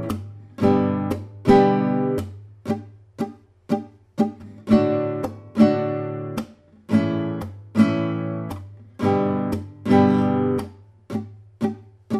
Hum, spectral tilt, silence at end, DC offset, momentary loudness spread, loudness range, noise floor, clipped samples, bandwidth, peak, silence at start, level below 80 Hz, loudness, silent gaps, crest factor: none; -8.5 dB/octave; 0 s; under 0.1%; 16 LU; 3 LU; -41 dBFS; under 0.1%; 14.5 kHz; -4 dBFS; 0 s; -52 dBFS; -22 LUFS; none; 18 dB